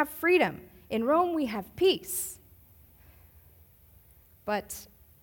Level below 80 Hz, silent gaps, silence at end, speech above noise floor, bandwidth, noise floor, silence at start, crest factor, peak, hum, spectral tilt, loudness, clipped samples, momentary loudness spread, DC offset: -60 dBFS; none; 0.4 s; 30 dB; 18 kHz; -58 dBFS; 0 s; 18 dB; -12 dBFS; none; -3.5 dB/octave; -28 LUFS; under 0.1%; 18 LU; under 0.1%